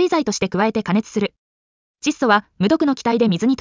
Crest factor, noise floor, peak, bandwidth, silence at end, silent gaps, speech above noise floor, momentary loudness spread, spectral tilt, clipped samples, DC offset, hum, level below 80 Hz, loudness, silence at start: 14 dB; under -90 dBFS; -4 dBFS; 7.6 kHz; 0.05 s; 1.38-1.94 s; over 72 dB; 7 LU; -5 dB/octave; under 0.1%; under 0.1%; none; -56 dBFS; -19 LUFS; 0 s